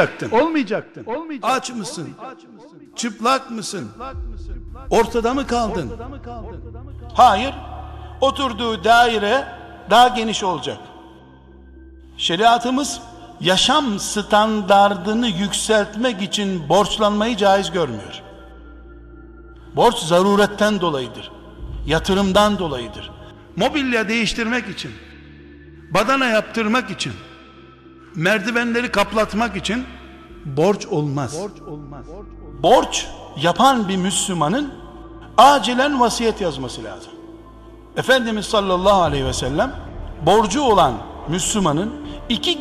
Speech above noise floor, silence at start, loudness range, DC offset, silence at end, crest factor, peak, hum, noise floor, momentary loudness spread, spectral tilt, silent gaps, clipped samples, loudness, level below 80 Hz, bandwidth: 26 dB; 0 s; 6 LU; under 0.1%; 0 s; 20 dB; 0 dBFS; none; -44 dBFS; 20 LU; -4 dB/octave; none; under 0.1%; -18 LUFS; -40 dBFS; 13.5 kHz